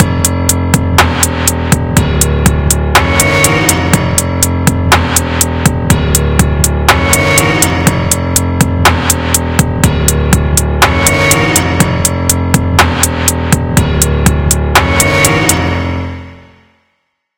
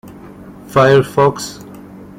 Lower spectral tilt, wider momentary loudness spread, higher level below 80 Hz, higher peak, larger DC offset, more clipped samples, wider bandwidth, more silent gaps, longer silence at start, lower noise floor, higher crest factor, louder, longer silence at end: second, -4 dB/octave vs -5.5 dB/octave; second, 4 LU vs 24 LU; first, -20 dBFS vs -48 dBFS; about the same, 0 dBFS vs -2 dBFS; neither; first, 1% vs under 0.1%; first, over 20 kHz vs 16 kHz; neither; about the same, 0 s vs 0.05 s; first, -64 dBFS vs -35 dBFS; about the same, 10 dB vs 14 dB; first, -10 LUFS vs -13 LUFS; first, 1 s vs 0.25 s